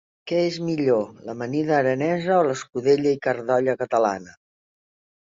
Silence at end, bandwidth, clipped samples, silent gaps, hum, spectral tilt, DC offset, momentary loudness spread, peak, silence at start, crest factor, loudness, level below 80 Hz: 1 s; 7.8 kHz; under 0.1%; none; none; -6 dB/octave; under 0.1%; 6 LU; -8 dBFS; 0.25 s; 16 dB; -22 LUFS; -66 dBFS